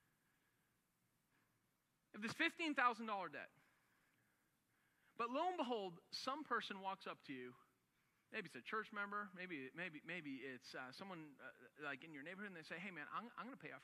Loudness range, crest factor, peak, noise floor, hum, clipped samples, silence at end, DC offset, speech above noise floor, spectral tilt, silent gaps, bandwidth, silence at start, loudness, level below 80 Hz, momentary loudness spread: 7 LU; 26 dB; -24 dBFS; -85 dBFS; none; under 0.1%; 0 s; under 0.1%; 37 dB; -4 dB/octave; none; 14.5 kHz; 2.15 s; -47 LUFS; under -90 dBFS; 14 LU